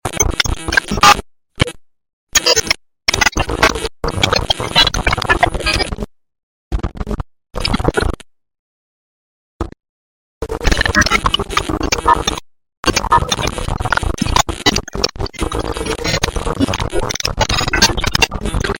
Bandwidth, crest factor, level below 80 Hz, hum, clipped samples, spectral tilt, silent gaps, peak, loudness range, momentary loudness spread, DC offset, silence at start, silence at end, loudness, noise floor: 17 kHz; 18 dB; -26 dBFS; none; under 0.1%; -3 dB/octave; 2.13-2.27 s, 6.43-6.71 s, 8.59-9.60 s, 9.89-10.41 s, 12.77-12.83 s; 0 dBFS; 9 LU; 13 LU; under 0.1%; 0.05 s; 0 s; -15 LUFS; under -90 dBFS